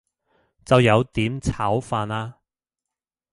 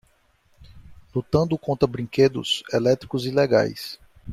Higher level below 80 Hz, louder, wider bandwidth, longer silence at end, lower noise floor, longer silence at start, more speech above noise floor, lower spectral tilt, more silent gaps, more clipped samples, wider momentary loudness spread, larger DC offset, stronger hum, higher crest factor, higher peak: first, -44 dBFS vs -52 dBFS; about the same, -21 LUFS vs -22 LUFS; second, 11.5 kHz vs 15 kHz; first, 1 s vs 0 s; first, -88 dBFS vs -62 dBFS; about the same, 0.7 s vs 0.6 s; first, 67 dB vs 40 dB; about the same, -6.5 dB/octave vs -6 dB/octave; neither; neither; about the same, 13 LU vs 11 LU; neither; neither; about the same, 20 dB vs 18 dB; about the same, -4 dBFS vs -4 dBFS